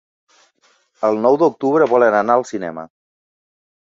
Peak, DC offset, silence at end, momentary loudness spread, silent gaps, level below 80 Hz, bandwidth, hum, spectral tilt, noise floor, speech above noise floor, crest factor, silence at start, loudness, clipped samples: -2 dBFS; under 0.1%; 1 s; 13 LU; none; -64 dBFS; 7.8 kHz; none; -6.5 dB/octave; -59 dBFS; 44 dB; 18 dB; 1 s; -16 LUFS; under 0.1%